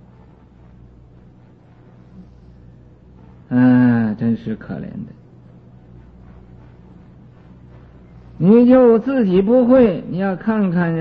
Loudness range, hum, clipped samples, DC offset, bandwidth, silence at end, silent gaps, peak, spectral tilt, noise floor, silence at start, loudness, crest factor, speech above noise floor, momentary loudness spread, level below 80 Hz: 14 LU; none; under 0.1%; under 0.1%; 4.7 kHz; 0 s; none; -2 dBFS; -11.5 dB/octave; -46 dBFS; 2.2 s; -15 LUFS; 16 dB; 32 dB; 18 LU; -48 dBFS